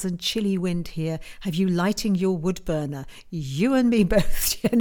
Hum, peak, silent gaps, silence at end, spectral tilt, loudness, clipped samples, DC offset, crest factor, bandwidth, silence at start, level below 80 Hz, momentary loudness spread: none; -6 dBFS; none; 0 s; -5.5 dB/octave; -24 LUFS; under 0.1%; under 0.1%; 16 dB; 19 kHz; 0 s; -36 dBFS; 11 LU